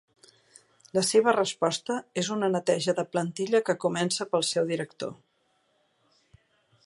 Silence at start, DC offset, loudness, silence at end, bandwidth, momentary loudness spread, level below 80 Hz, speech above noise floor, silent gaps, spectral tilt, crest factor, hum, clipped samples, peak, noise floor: 0.95 s; under 0.1%; -27 LUFS; 1.7 s; 12 kHz; 9 LU; -76 dBFS; 44 dB; none; -4 dB/octave; 22 dB; none; under 0.1%; -8 dBFS; -71 dBFS